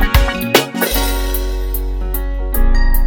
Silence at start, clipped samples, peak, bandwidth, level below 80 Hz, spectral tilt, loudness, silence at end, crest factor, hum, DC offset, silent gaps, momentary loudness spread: 0 s; under 0.1%; 0 dBFS; over 20 kHz; -14 dBFS; -4 dB/octave; -17 LUFS; 0 s; 14 dB; none; under 0.1%; none; 8 LU